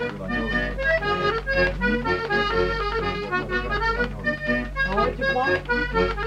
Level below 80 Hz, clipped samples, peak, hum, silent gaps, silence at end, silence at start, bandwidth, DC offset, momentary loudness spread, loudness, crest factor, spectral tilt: -34 dBFS; under 0.1%; -10 dBFS; none; none; 0 s; 0 s; 10.5 kHz; under 0.1%; 4 LU; -23 LUFS; 14 dB; -6 dB/octave